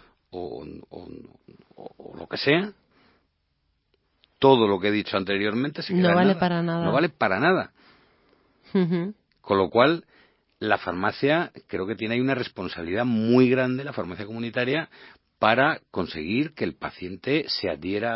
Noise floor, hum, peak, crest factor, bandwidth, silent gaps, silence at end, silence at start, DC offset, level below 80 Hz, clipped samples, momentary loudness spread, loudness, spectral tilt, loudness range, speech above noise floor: -72 dBFS; none; -2 dBFS; 22 dB; 5.8 kHz; none; 0 s; 0.35 s; under 0.1%; -58 dBFS; under 0.1%; 16 LU; -24 LUFS; -10.5 dB/octave; 5 LU; 49 dB